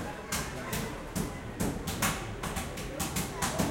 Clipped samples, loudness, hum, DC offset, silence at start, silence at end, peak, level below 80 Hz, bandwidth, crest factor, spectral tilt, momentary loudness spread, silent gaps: under 0.1%; -34 LUFS; none; under 0.1%; 0 s; 0 s; -14 dBFS; -46 dBFS; 17 kHz; 20 dB; -4 dB/octave; 5 LU; none